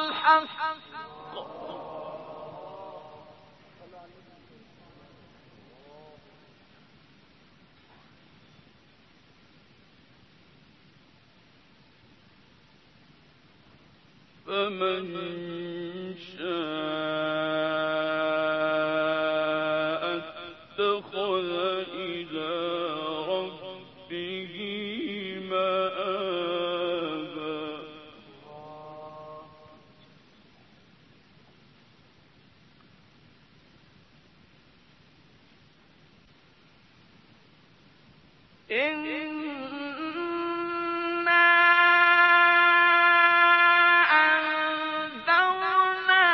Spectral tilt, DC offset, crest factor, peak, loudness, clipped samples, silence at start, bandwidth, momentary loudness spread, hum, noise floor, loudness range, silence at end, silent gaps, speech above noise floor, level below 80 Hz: -6 dB/octave; under 0.1%; 22 dB; -6 dBFS; -24 LUFS; under 0.1%; 0 s; 6.2 kHz; 24 LU; none; -59 dBFS; 22 LU; 0 s; none; 30 dB; -72 dBFS